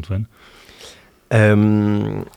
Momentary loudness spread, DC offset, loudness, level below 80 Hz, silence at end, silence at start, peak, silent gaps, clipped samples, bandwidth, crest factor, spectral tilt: 13 LU; under 0.1%; -17 LUFS; -50 dBFS; 0.15 s; 0 s; -2 dBFS; none; under 0.1%; 9.8 kHz; 16 dB; -8 dB/octave